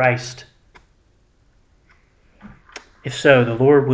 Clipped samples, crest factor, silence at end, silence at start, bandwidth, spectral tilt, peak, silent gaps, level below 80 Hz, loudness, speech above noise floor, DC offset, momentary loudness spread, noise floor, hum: under 0.1%; 20 dB; 0 s; 0 s; 8 kHz; -6 dB/octave; 0 dBFS; none; -54 dBFS; -16 LUFS; 42 dB; under 0.1%; 26 LU; -58 dBFS; none